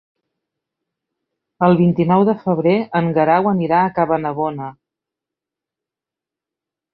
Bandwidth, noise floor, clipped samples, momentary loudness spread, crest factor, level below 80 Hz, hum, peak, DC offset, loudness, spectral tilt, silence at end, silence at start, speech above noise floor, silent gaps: 4.8 kHz; -87 dBFS; under 0.1%; 8 LU; 18 dB; -58 dBFS; none; -2 dBFS; under 0.1%; -16 LUFS; -11.5 dB/octave; 2.2 s; 1.6 s; 71 dB; none